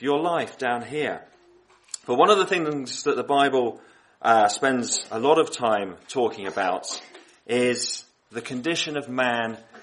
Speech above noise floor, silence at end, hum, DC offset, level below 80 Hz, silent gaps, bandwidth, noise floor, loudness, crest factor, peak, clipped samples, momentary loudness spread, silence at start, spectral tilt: 33 dB; 0 s; none; under 0.1%; -72 dBFS; none; 11.5 kHz; -57 dBFS; -24 LUFS; 20 dB; -4 dBFS; under 0.1%; 13 LU; 0 s; -3 dB/octave